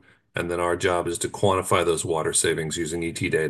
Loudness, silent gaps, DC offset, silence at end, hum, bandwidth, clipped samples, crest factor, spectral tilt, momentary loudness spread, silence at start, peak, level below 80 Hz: -24 LUFS; none; under 0.1%; 0 s; none; 12.5 kHz; under 0.1%; 18 dB; -3.5 dB/octave; 7 LU; 0.35 s; -6 dBFS; -46 dBFS